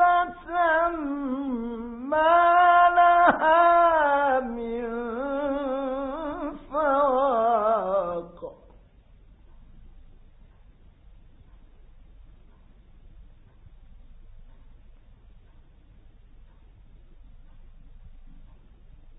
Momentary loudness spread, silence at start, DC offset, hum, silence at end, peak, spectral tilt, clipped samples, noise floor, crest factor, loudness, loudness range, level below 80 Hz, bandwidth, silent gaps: 15 LU; 0 s; under 0.1%; none; 0.75 s; -4 dBFS; -8.5 dB/octave; under 0.1%; -53 dBFS; 22 dB; -23 LUFS; 9 LU; -52 dBFS; 4 kHz; none